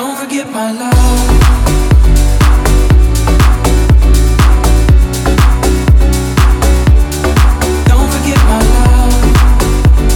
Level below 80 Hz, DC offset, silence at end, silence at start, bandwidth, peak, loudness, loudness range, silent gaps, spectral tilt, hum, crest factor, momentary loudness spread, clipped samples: -8 dBFS; under 0.1%; 0 s; 0 s; 17 kHz; 0 dBFS; -10 LUFS; 1 LU; none; -5.5 dB/octave; none; 8 dB; 3 LU; 0.3%